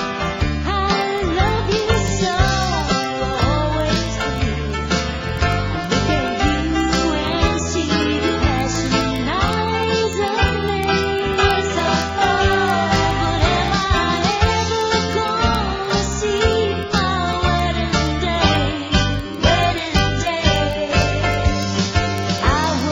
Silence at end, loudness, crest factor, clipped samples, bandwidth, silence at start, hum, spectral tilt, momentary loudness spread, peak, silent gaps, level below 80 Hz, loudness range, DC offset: 0 s; -18 LUFS; 16 dB; under 0.1%; 16 kHz; 0 s; none; -5 dB/octave; 3 LU; -2 dBFS; none; -26 dBFS; 2 LU; under 0.1%